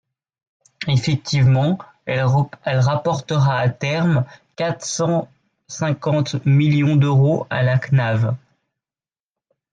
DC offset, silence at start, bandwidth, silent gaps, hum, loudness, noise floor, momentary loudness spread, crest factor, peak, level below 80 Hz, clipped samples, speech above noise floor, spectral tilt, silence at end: under 0.1%; 0.8 s; 9 kHz; none; none; -19 LUFS; under -90 dBFS; 9 LU; 12 dB; -6 dBFS; -54 dBFS; under 0.1%; over 72 dB; -6.5 dB/octave; 1.35 s